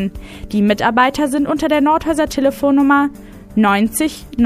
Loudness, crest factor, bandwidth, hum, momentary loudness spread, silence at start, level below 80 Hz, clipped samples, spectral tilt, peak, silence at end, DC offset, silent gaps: -15 LUFS; 14 dB; 15.5 kHz; none; 9 LU; 0 s; -38 dBFS; under 0.1%; -5 dB/octave; 0 dBFS; 0 s; under 0.1%; none